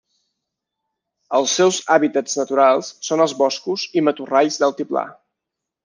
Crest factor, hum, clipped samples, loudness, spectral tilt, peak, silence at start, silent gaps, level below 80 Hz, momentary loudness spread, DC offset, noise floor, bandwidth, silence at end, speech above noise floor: 18 dB; none; under 0.1%; -18 LUFS; -3 dB/octave; 0 dBFS; 1.3 s; none; -70 dBFS; 8 LU; under 0.1%; -83 dBFS; 10.5 kHz; 0.7 s; 65 dB